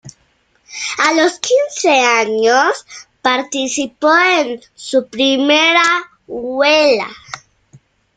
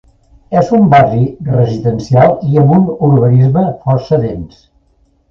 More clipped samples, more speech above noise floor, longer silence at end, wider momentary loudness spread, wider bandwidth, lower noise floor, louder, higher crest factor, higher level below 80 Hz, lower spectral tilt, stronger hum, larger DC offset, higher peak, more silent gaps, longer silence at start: neither; about the same, 44 dB vs 44 dB; about the same, 0.8 s vs 0.85 s; first, 16 LU vs 8 LU; first, 9.6 kHz vs 6.8 kHz; first, -58 dBFS vs -54 dBFS; about the same, -13 LUFS vs -11 LUFS; about the same, 14 dB vs 10 dB; second, -60 dBFS vs -38 dBFS; second, -1.5 dB/octave vs -9.5 dB/octave; neither; neither; about the same, 0 dBFS vs 0 dBFS; neither; second, 0.05 s vs 0.5 s